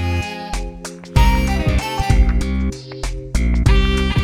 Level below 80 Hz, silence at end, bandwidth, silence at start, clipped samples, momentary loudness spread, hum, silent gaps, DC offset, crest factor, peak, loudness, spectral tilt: -18 dBFS; 0 s; 15 kHz; 0 s; under 0.1%; 12 LU; none; none; under 0.1%; 16 dB; 0 dBFS; -19 LUFS; -5.5 dB/octave